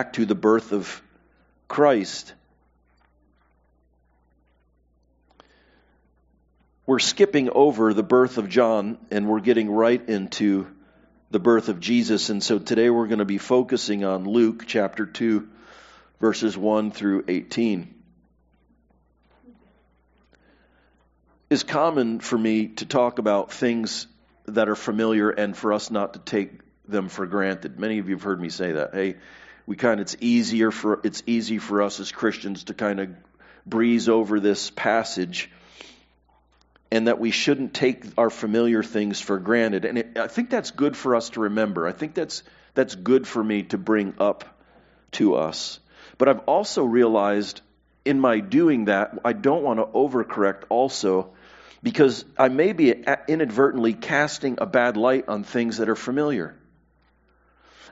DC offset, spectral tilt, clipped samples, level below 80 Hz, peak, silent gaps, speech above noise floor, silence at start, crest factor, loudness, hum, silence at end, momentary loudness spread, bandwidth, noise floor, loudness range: under 0.1%; -4 dB/octave; under 0.1%; -64 dBFS; -2 dBFS; none; 42 dB; 0 s; 22 dB; -23 LUFS; none; 1.4 s; 9 LU; 8 kHz; -64 dBFS; 6 LU